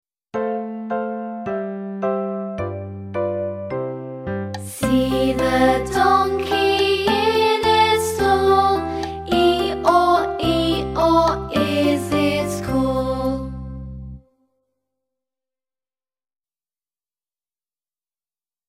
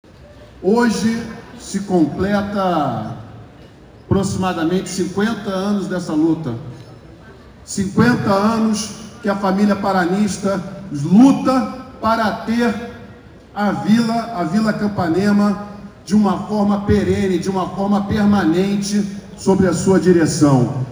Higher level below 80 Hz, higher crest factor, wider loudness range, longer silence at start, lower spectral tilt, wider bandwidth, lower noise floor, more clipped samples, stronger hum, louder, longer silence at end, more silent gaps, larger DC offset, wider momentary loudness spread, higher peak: about the same, -40 dBFS vs -44 dBFS; about the same, 20 dB vs 18 dB; first, 9 LU vs 4 LU; first, 0.35 s vs 0.2 s; about the same, -5 dB/octave vs -6 dB/octave; second, 16 kHz vs over 20 kHz; first, under -90 dBFS vs -41 dBFS; neither; neither; second, -20 LUFS vs -17 LUFS; first, 4.5 s vs 0 s; neither; neither; about the same, 12 LU vs 12 LU; about the same, -2 dBFS vs 0 dBFS